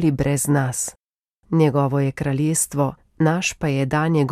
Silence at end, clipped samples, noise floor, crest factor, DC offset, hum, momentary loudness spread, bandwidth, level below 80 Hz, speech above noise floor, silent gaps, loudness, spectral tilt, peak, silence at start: 0 s; under 0.1%; -64 dBFS; 16 dB; under 0.1%; none; 6 LU; 15.5 kHz; -46 dBFS; 44 dB; 1.03-1.08 s, 1.14-1.22 s, 1.28-1.32 s; -21 LUFS; -5.5 dB/octave; -4 dBFS; 0 s